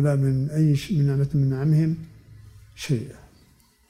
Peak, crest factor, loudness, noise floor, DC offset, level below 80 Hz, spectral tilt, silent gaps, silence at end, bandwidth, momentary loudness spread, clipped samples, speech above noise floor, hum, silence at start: -10 dBFS; 12 dB; -23 LUFS; -58 dBFS; under 0.1%; -50 dBFS; -8 dB/octave; none; 0.75 s; 12.5 kHz; 13 LU; under 0.1%; 36 dB; none; 0 s